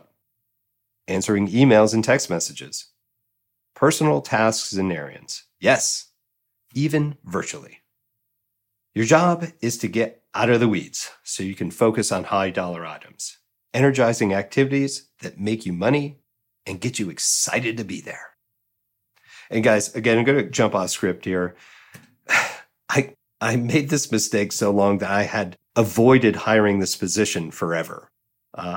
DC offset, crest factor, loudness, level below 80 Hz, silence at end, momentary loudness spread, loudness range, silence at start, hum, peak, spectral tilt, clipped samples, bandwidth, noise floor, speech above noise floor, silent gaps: under 0.1%; 18 dB; -21 LUFS; -66 dBFS; 0 s; 15 LU; 5 LU; 1.1 s; none; -4 dBFS; -4.5 dB/octave; under 0.1%; 17 kHz; -77 dBFS; 56 dB; none